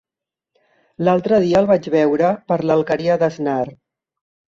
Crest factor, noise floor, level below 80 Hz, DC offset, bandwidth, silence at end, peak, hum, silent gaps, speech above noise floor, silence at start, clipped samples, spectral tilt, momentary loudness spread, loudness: 16 dB; -87 dBFS; -56 dBFS; under 0.1%; 7.6 kHz; 0.85 s; -2 dBFS; none; none; 70 dB; 1 s; under 0.1%; -7.5 dB/octave; 7 LU; -17 LUFS